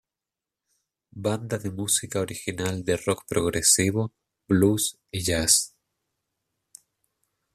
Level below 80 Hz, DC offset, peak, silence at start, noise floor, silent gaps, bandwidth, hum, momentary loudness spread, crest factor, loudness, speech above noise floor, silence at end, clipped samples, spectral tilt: -54 dBFS; under 0.1%; -4 dBFS; 1.15 s; -89 dBFS; none; 14.5 kHz; none; 11 LU; 22 dB; -24 LUFS; 64 dB; 1.85 s; under 0.1%; -3.5 dB/octave